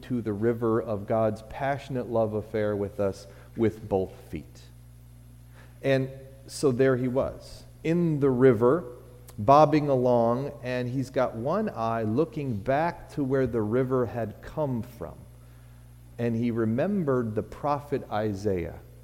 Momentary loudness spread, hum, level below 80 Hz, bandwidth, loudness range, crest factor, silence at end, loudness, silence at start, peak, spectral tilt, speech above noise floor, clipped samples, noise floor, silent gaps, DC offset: 14 LU; 60 Hz at -50 dBFS; -52 dBFS; 16 kHz; 7 LU; 22 dB; 0 s; -27 LUFS; 0 s; -6 dBFS; -8 dB/octave; 23 dB; under 0.1%; -49 dBFS; none; under 0.1%